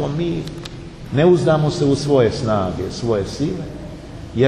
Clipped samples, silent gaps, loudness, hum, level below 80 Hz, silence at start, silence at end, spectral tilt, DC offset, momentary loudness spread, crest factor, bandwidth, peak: under 0.1%; none; -18 LUFS; none; -40 dBFS; 0 s; 0 s; -7 dB/octave; under 0.1%; 18 LU; 16 dB; 11.5 kHz; -2 dBFS